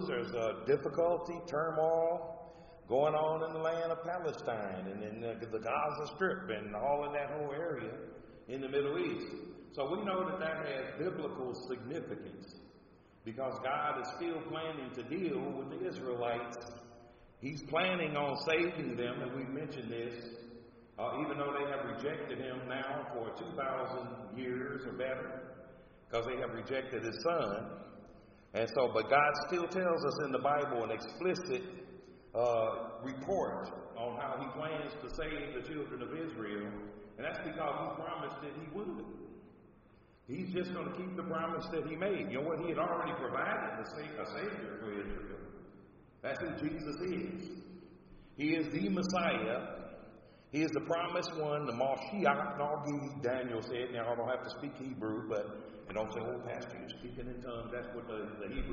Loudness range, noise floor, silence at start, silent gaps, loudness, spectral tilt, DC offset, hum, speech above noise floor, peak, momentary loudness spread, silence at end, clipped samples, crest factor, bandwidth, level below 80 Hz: 7 LU; -63 dBFS; 0 s; none; -38 LUFS; -4 dB/octave; under 0.1%; none; 26 dB; -14 dBFS; 14 LU; 0 s; under 0.1%; 24 dB; 7 kHz; -60 dBFS